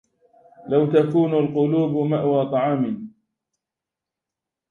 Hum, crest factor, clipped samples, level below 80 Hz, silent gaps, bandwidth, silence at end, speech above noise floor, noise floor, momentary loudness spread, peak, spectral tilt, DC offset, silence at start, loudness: none; 18 dB; under 0.1%; -66 dBFS; none; 6.4 kHz; 1.6 s; 67 dB; -87 dBFS; 7 LU; -4 dBFS; -10 dB/octave; under 0.1%; 0.65 s; -20 LUFS